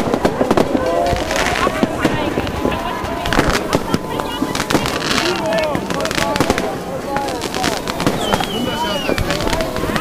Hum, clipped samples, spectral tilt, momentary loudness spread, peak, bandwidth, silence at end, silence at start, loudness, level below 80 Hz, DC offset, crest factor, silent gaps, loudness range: none; under 0.1%; -4.5 dB/octave; 5 LU; 0 dBFS; 16 kHz; 0 s; 0 s; -18 LUFS; -32 dBFS; under 0.1%; 18 dB; none; 1 LU